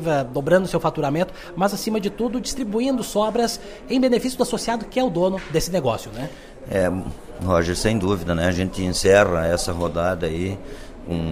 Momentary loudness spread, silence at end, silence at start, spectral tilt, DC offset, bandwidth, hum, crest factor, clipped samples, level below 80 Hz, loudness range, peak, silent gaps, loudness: 11 LU; 0 s; 0 s; -5 dB/octave; under 0.1%; 15.5 kHz; none; 20 dB; under 0.1%; -40 dBFS; 3 LU; -2 dBFS; none; -22 LUFS